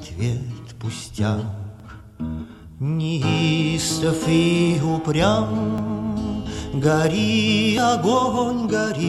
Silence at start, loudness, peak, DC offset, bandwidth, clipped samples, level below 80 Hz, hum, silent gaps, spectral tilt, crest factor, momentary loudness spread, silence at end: 0 s; -21 LUFS; -6 dBFS; under 0.1%; 13 kHz; under 0.1%; -44 dBFS; none; none; -5.5 dB/octave; 16 dB; 13 LU; 0 s